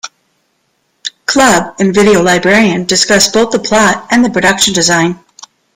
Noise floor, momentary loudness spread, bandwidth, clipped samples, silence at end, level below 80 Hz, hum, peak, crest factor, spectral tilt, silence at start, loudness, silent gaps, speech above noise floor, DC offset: -61 dBFS; 10 LU; 17 kHz; under 0.1%; 0.6 s; -42 dBFS; none; 0 dBFS; 10 dB; -3 dB/octave; 0.05 s; -9 LUFS; none; 51 dB; under 0.1%